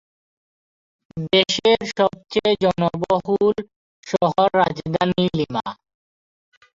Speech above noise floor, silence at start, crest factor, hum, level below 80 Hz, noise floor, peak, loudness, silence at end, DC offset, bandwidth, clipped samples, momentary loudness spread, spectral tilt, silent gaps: over 71 dB; 1.15 s; 20 dB; none; -54 dBFS; under -90 dBFS; -2 dBFS; -20 LUFS; 1 s; under 0.1%; 7.6 kHz; under 0.1%; 10 LU; -5 dB/octave; 3.76-4.03 s